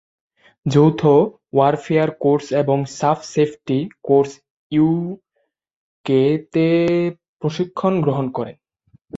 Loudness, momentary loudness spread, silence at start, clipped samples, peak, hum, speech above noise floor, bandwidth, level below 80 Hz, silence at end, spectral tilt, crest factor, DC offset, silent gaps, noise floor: -18 LUFS; 11 LU; 0.65 s; under 0.1%; -2 dBFS; none; 39 dB; 7.8 kHz; -58 dBFS; 0 s; -7.5 dB/octave; 16 dB; under 0.1%; 4.50-4.70 s, 5.73-6.04 s, 7.28-7.37 s; -56 dBFS